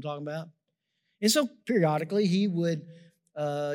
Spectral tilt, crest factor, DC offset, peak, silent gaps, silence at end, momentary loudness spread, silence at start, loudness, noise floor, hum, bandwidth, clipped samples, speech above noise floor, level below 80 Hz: -5 dB/octave; 18 dB; under 0.1%; -10 dBFS; none; 0 s; 13 LU; 0 s; -28 LUFS; -80 dBFS; none; 16 kHz; under 0.1%; 53 dB; -88 dBFS